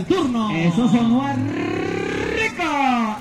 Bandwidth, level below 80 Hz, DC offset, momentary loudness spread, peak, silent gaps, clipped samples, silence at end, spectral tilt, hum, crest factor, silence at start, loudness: 11.5 kHz; -46 dBFS; under 0.1%; 6 LU; -6 dBFS; none; under 0.1%; 0 s; -6 dB/octave; none; 14 dB; 0 s; -20 LUFS